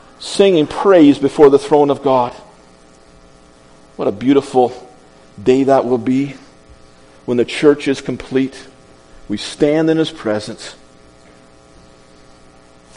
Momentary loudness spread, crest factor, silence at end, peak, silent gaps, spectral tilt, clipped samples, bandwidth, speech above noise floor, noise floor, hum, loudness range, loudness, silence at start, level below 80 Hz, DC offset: 14 LU; 16 dB; 2.25 s; 0 dBFS; none; -6 dB/octave; 0.1%; 10.5 kHz; 31 dB; -45 dBFS; none; 7 LU; -14 LUFS; 0.2 s; -48 dBFS; under 0.1%